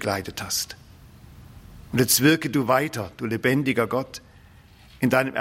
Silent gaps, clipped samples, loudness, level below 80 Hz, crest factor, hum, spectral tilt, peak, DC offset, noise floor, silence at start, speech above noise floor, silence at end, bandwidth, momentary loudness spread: none; under 0.1%; -23 LUFS; -54 dBFS; 20 dB; none; -4 dB/octave; -4 dBFS; under 0.1%; -50 dBFS; 0 s; 27 dB; 0 s; 16.5 kHz; 14 LU